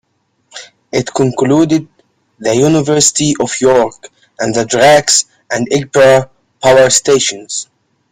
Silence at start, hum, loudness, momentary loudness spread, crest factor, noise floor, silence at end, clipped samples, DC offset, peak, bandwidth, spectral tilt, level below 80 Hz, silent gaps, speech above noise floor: 0.55 s; none; -11 LUFS; 13 LU; 12 dB; -60 dBFS; 0.5 s; under 0.1%; under 0.1%; 0 dBFS; 16 kHz; -3.5 dB/octave; -48 dBFS; none; 49 dB